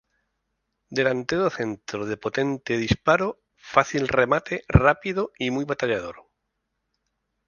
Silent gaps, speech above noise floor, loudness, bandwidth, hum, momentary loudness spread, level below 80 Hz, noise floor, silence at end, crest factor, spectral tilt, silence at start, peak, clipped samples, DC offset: none; 55 dB; -24 LUFS; 7.2 kHz; none; 10 LU; -40 dBFS; -78 dBFS; 1.25 s; 24 dB; -6 dB/octave; 0.9 s; 0 dBFS; under 0.1%; under 0.1%